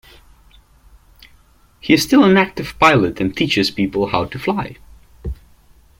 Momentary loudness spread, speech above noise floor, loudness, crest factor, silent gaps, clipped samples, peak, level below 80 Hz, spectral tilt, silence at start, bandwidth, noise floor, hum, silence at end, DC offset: 20 LU; 35 dB; -16 LUFS; 18 dB; none; under 0.1%; 0 dBFS; -40 dBFS; -5 dB/octave; 1.85 s; 16.5 kHz; -51 dBFS; none; 0.65 s; under 0.1%